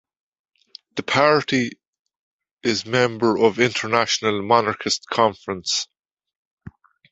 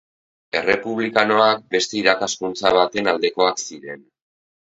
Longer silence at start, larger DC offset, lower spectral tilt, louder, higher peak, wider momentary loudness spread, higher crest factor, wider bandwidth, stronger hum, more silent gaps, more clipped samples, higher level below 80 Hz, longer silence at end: first, 0.95 s vs 0.55 s; neither; about the same, -3.5 dB/octave vs -2.5 dB/octave; about the same, -20 LUFS vs -19 LUFS; about the same, 0 dBFS vs 0 dBFS; second, 10 LU vs 13 LU; about the same, 22 dB vs 20 dB; about the same, 8.2 kHz vs 8 kHz; neither; first, 1.87-1.93 s, 1.99-2.06 s, 2.19-2.39 s, 2.53-2.57 s, 6.35-6.57 s vs none; neither; about the same, -58 dBFS vs -60 dBFS; second, 0.45 s vs 0.8 s